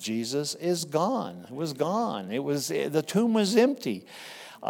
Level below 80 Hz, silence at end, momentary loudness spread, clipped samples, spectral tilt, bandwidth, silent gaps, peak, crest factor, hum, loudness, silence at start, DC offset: -82 dBFS; 0 s; 14 LU; under 0.1%; -5 dB/octave; 17.5 kHz; none; -8 dBFS; 20 dB; none; -27 LUFS; 0 s; under 0.1%